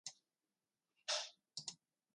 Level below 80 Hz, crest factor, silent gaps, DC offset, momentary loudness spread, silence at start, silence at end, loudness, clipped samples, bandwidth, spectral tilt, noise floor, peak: under -90 dBFS; 24 dB; none; under 0.1%; 12 LU; 0.05 s; 0.4 s; -46 LUFS; under 0.1%; 11 kHz; 1 dB/octave; under -90 dBFS; -28 dBFS